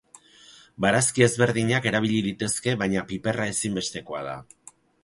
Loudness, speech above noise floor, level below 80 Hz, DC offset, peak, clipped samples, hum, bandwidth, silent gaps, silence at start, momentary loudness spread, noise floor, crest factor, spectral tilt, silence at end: -24 LUFS; 28 dB; -56 dBFS; under 0.1%; -4 dBFS; under 0.1%; none; 11.5 kHz; none; 0.5 s; 13 LU; -52 dBFS; 22 dB; -4 dB/octave; 0.6 s